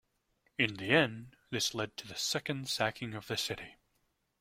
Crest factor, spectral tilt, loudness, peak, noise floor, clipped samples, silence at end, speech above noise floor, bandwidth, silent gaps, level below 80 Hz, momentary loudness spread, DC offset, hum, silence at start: 24 dB; -3.5 dB/octave; -33 LUFS; -12 dBFS; -78 dBFS; under 0.1%; 0.7 s; 44 dB; 16 kHz; none; -68 dBFS; 15 LU; under 0.1%; none; 0.6 s